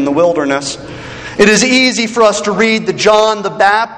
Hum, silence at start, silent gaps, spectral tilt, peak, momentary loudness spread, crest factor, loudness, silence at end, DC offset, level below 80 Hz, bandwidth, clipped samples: none; 0 s; none; -3 dB/octave; 0 dBFS; 14 LU; 12 dB; -11 LUFS; 0 s; under 0.1%; -44 dBFS; 12 kHz; 0.4%